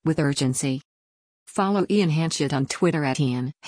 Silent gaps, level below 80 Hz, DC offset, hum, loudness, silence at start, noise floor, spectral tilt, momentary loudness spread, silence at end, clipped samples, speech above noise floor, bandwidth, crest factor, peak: 0.85-1.46 s; -58 dBFS; under 0.1%; none; -23 LUFS; 0.05 s; under -90 dBFS; -5.5 dB/octave; 5 LU; 0 s; under 0.1%; over 67 dB; 10.5 kHz; 14 dB; -10 dBFS